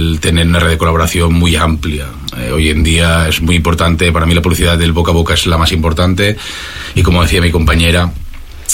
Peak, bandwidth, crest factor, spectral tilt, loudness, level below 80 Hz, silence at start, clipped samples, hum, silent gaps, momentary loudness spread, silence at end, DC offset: 0 dBFS; 16.5 kHz; 10 dB; -5 dB/octave; -11 LUFS; -18 dBFS; 0 s; under 0.1%; none; none; 9 LU; 0 s; under 0.1%